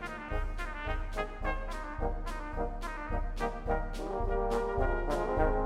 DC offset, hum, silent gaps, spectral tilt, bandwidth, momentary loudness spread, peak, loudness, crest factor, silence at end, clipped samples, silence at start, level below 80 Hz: under 0.1%; none; none; -6.5 dB/octave; 11.5 kHz; 7 LU; -16 dBFS; -35 LUFS; 18 dB; 0 s; under 0.1%; 0 s; -36 dBFS